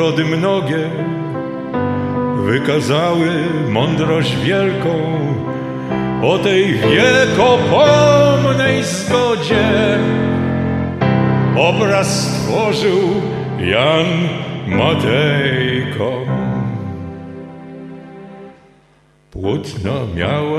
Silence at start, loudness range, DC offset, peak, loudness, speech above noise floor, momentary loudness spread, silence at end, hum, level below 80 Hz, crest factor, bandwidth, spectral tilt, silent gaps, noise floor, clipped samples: 0 s; 11 LU; under 0.1%; 0 dBFS; -15 LUFS; 38 dB; 12 LU; 0 s; none; -46 dBFS; 16 dB; 13.5 kHz; -5.5 dB/octave; none; -52 dBFS; under 0.1%